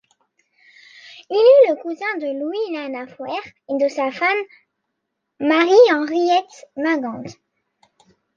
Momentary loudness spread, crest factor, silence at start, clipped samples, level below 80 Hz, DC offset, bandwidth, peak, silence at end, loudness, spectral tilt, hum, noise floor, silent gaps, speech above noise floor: 18 LU; 18 dB; 1.05 s; under 0.1%; -74 dBFS; under 0.1%; 7.4 kHz; -2 dBFS; 1.05 s; -18 LUFS; -4 dB/octave; none; -77 dBFS; none; 59 dB